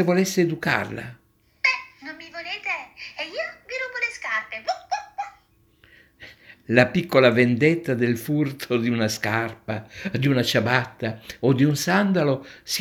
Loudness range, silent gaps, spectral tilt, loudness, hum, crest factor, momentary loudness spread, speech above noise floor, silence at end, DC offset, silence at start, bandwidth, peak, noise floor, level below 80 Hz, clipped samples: 8 LU; none; -5.5 dB/octave; -23 LUFS; none; 22 dB; 14 LU; 37 dB; 0 s; under 0.1%; 0 s; 19 kHz; -2 dBFS; -59 dBFS; -60 dBFS; under 0.1%